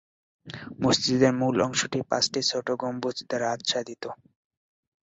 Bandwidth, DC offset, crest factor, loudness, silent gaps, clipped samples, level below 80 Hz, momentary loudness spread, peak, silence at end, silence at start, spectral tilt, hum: 8 kHz; under 0.1%; 20 dB; -25 LUFS; none; under 0.1%; -62 dBFS; 17 LU; -8 dBFS; 0.9 s; 0.45 s; -4 dB/octave; none